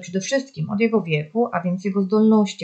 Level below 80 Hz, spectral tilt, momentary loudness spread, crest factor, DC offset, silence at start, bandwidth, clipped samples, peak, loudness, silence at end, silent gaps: -68 dBFS; -6 dB/octave; 8 LU; 14 dB; under 0.1%; 0 s; 8.4 kHz; under 0.1%; -6 dBFS; -21 LUFS; 0 s; none